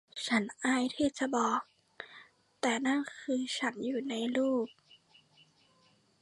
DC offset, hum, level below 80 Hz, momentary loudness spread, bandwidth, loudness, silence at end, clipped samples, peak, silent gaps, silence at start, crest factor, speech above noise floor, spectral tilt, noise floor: under 0.1%; none; -74 dBFS; 16 LU; 11.5 kHz; -33 LUFS; 1.55 s; under 0.1%; -16 dBFS; none; 0.15 s; 18 dB; 36 dB; -3.5 dB/octave; -68 dBFS